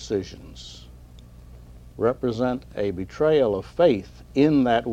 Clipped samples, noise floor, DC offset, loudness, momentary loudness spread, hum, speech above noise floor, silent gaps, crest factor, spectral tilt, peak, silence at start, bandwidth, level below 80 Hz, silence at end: under 0.1%; -45 dBFS; under 0.1%; -23 LUFS; 21 LU; none; 23 dB; none; 18 dB; -7 dB/octave; -6 dBFS; 0 s; 9.6 kHz; -46 dBFS; 0 s